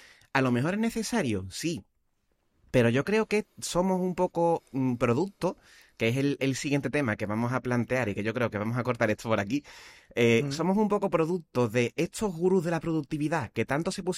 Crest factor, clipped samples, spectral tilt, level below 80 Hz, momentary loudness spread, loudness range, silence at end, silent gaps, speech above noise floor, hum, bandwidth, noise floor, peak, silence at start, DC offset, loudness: 20 dB; under 0.1%; -6 dB/octave; -58 dBFS; 6 LU; 2 LU; 0 s; none; 45 dB; none; 15.5 kHz; -73 dBFS; -8 dBFS; 0.35 s; under 0.1%; -28 LUFS